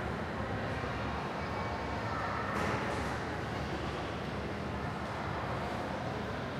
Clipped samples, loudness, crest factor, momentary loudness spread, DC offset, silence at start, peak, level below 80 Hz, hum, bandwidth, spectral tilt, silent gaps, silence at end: under 0.1%; -36 LUFS; 16 dB; 4 LU; under 0.1%; 0 s; -20 dBFS; -48 dBFS; none; 15.5 kHz; -6 dB/octave; none; 0 s